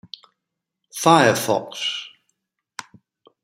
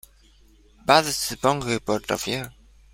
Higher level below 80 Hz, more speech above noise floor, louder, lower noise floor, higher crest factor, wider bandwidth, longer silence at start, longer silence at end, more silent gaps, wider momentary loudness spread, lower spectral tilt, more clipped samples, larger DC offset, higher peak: second, -68 dBFS vs -52 dBFS; first, 64 dB vs 32 dB; first, -19 LUFS vs -23 LUFS; first, -82 dBFS vs -55 dBFS; about the same, 22 dB vs 24 dB; about the same, 16 kHz vs 16.5 kHz; about the same, 0.95 s vs 0.85 s; first, 1.35 s vs 0.45 s; neither; first, 26 LU vs 12 LU; about the same, -3.5 dB/octave vs -3.5 dB/octave; neither; neither; about the same, -2 dBFS vs 0 dBFS